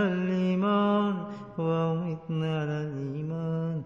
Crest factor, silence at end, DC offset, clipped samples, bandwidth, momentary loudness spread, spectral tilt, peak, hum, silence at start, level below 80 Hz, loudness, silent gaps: 14 dB; 0 s; under 0.1%; under 0.1%; 6.8 kHz; 9 LU; -9 dB/octave; -14 dBFS; none; 0 s; -66 dBFS; -29 LUFS; none